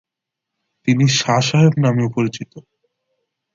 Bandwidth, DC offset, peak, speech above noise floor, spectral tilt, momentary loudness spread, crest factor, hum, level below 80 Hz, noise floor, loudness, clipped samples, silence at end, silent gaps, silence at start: 7.6 kHz; under 0.1%; -2 dBFS; 67 dB; -5.5 dB/octave; 12 LU; 18 dB; none; -58 dBFS; -83 dBFS; -16 LUFS; under 0.1%; 0.95 s; none; 0.85 s